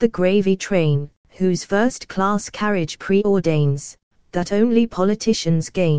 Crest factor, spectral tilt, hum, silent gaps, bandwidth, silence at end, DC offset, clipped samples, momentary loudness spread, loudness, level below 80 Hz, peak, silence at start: 16 dB; -6 dB/octave; none; 1.17-1.24 s, 4.03-4.11 s; 9.8 kHz; 0 s; 2%; under 0.1%; 7 LU; -20 LUFS; -48 dBFS; -4 dBFS; 0 s